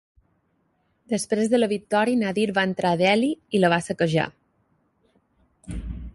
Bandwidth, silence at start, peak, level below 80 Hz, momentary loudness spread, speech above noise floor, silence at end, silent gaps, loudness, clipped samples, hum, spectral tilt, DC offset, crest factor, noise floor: 11.5 kHz; 1.1 s; -6 dBFS; -46 dBFS; 12 LU; 47 dB; 0.05 s; none; -22 LUFS; under 0.1%; none; -5.5 dB/octave; under 0.1%; 18 dB; -69 dBFS